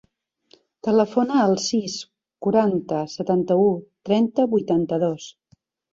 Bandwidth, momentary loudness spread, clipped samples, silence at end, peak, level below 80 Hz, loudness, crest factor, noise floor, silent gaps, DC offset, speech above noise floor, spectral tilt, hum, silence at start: 7.8 kHz; 11 LU; under 0.1%; 0.6 s; -6 dBFS; -64 dBFS; -21 LUFS; 16 dB; -61 dBFS; none; under 0.1%; 41 dB; -6 dB/octave; none; 0.85 s